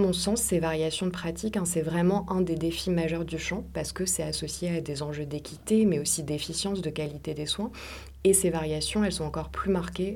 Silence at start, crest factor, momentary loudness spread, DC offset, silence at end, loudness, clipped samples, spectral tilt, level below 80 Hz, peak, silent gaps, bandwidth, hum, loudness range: 0 s; 20 dB; 10 LU; under 0.1%; 0 s; -28 LUFS; under 0.1%; -4.5 dB/octave; -46 dBFS; -8 dBFS; none; 18 kHz; none; 2 LU